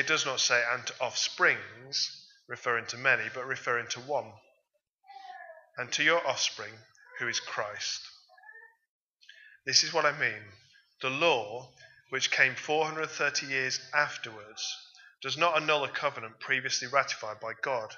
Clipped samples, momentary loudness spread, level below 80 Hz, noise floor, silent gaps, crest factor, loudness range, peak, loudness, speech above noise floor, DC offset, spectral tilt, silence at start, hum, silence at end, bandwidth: under 0.1%; 17 LU; -84 dBFS; -77 dBFS; 4.91-4.98 s, 8.88-9.12 s; 24 dB; 4 LU; -8 dBFS; -29 LUFS; 46 dB; under 0.1%; -1 dB/octave; 0 s; none; 0 s; 7.6 kHz